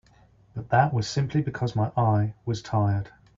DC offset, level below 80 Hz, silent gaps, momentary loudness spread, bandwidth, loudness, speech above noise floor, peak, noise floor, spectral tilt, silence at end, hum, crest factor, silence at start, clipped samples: under 0.1%; -54 dBFS; none; 9 LU; 7.6 kHz; -26 LUFS; 33 dB; -8 dBFS; -57 dBFS; -7 dB/octave; 0.3 s; none; 18 dB; 0.55 s; under 0.1%